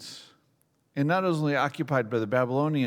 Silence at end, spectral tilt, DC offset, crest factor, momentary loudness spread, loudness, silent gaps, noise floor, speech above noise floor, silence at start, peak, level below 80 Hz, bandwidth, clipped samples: 0 s; -7 dB/octave; under 0.1%; 18 dB; 13 LU; -26 LUFS; none; -69 dBFS; 44 dB; 0 s; -10 dBFS; -82 dBFS; 15 kHz; under 0.1%